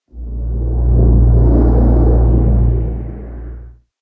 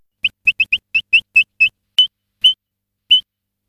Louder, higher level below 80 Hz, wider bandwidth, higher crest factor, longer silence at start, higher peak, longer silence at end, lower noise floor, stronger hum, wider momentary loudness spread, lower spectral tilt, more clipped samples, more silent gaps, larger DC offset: about the same, -13 LUFS vs -14 LUFS; first, -14 dBFS vs -60 dBFS; second, 1.8 kHz vs 16 kHz; about the same, 12 dB vs 14 dB; about the same, 0.15 s vs 0.25 s; about the same, 0 dBFS vs -2 dBFS; second, 0.3 s vs 0.5 s; second, -34 dBFS vs -78 dBFS; neither; first, 18 LU vs 5 LU; first, -14 dB/octave vs 2 dB/octave; neither; neither; neither